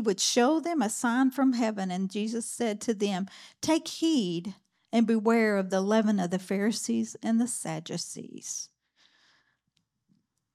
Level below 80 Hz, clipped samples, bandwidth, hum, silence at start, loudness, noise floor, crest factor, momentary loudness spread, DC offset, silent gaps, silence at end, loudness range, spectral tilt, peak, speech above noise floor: -78 dBFS; under 0.1%; 14.5 kHz; none; 0 s; -28 LUFS; -77 dBFS; 18 dB; 12 LU; under 0.1%; none; 1.9 s; 6 LU; -4 dB/octave; -12 dBFS; 50 dB